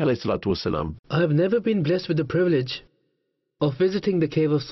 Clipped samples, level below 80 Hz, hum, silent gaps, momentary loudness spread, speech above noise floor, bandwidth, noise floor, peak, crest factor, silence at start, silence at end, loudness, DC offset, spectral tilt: under 0.1%; -50 dBFS; none; 0.99-1.03 s; 6 LU; 53 dB; 6 kHz; -75 dBFS; -12 dBFS; 12 dB; 0 s; 0 s; -23 LUFS; under 0.1%; -8 dB/octave